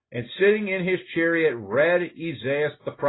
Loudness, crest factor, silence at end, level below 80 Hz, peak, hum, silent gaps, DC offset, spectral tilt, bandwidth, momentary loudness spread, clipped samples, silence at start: -23 LUFS; 16 dB; 0 s; -66 dBFS; -8 dBFS; none; none; under 0.1%; -10.5 dB/octave; 4.1 kHz; 9 LU; under 0.1%; 0.1 s